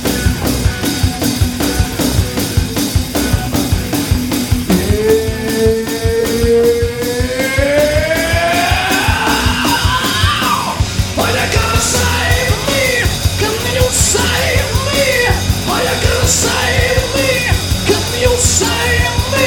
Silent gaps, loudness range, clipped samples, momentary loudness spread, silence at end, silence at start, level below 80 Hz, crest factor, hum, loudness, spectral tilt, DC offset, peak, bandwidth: none; 3 LU; under 0.1%; 4 LU; 0 s; 0 s; -22 dBFS; 14 dB; none; -13 LUFS; -4 dB/octave; under 0.1%; 0 dBFS; 19.5 kHz